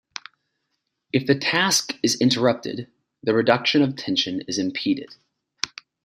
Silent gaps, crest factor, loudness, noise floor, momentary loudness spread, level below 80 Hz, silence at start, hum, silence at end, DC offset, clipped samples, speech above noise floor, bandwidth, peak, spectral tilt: none; 24 dB; -22 LUFS; -77 dBFS; 12 LU; -66 dBFS; 1.15 s; none; 0.35 s; under 0.1%; under 0.1%; 55 dB; 15.5 kHz; 0 dBFS; -3.5 dB/octave